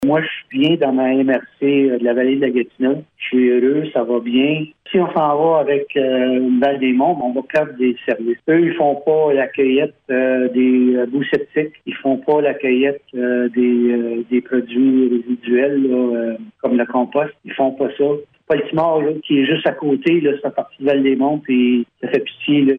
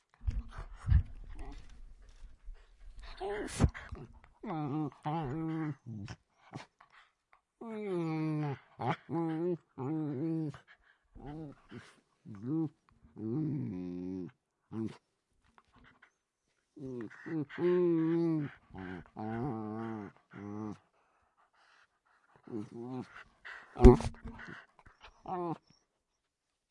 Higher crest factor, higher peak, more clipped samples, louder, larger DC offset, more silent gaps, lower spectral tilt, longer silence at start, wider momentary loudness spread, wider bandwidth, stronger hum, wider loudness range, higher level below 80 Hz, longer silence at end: second, 14 dB vs 32 dB; about the same, -4 dBFS vs -4 dBFS; neither; first, -17 LUFS vs -35 LUFS; neither; neither; about the same, -8.5 dB/octave vs -8 dB/octave; second, 0 s vs 0.2 s; second, 6 LU vs 20 LU; second, 3.9 kHz vs 11 kHz; neither; second, 2 LU vs 14 LU; second, -62 dBFS vs -42 dBFS; second, 0 s vs 1.15 s